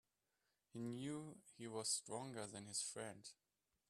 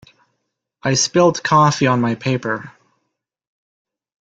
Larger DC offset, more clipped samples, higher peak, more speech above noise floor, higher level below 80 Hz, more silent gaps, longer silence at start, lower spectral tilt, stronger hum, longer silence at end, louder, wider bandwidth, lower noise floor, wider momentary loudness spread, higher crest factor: neither; neither; second, -28 dBFS vs -2 dBFS; second, 39 dB vs 59 dB; second, -88 dBFS vs -56 dBFS; neither; about the same, 0.75 s vs 0.85 s; second, -3 dB/octave vs -4.5 dB/octave; neither; second, 0.55 s vs 1.5 s; second, -48 LUFS vs -17 LUFS; first, 13 kHz vs 9.4 kHz; first, -88 dBFS vs -75 dBFS; first, 16 LU vs 11 LU; about the same, 22 dB vs 18 dB